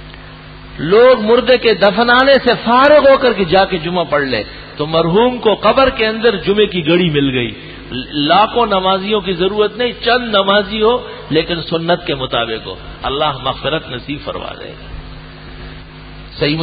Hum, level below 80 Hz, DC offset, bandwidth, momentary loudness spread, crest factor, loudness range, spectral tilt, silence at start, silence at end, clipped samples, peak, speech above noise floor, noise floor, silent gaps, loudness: none; -36 dBFS; under 0.1%; 5 kHz; 22 LU; 14 dB; 10 LU; -8 dB/octave; 0 s; 0 s; under 0.1%; 0 dBFS; 21 dB; -34 dBFS; none; -13 LUFS